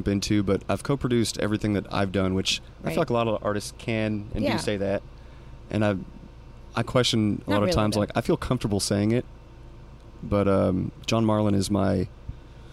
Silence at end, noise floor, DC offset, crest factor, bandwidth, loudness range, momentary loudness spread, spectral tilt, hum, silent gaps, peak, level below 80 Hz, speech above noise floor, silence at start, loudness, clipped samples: 0 s; -44 dBFS; under 0.1%; 18 dB; 15 kHz; 3 LU; 9 LU; -5.5 dB/octave; none; none; -8 dBFS; -44 dBFS; 20 dB; 0 s; -25 LUFS; under 0.1%